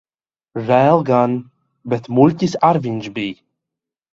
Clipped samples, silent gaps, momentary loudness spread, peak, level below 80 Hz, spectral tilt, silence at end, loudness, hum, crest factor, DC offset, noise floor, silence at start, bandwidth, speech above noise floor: under 0.1%; none; 14 LU; 0 dBFS; -58 dBFS; -7.5 dB/octave; 0.8 s; -17 LUFS; none; 18 dB; under 0.1%; under -90 dBFS; 0.55 s; 7.8 kHz; over 74 dB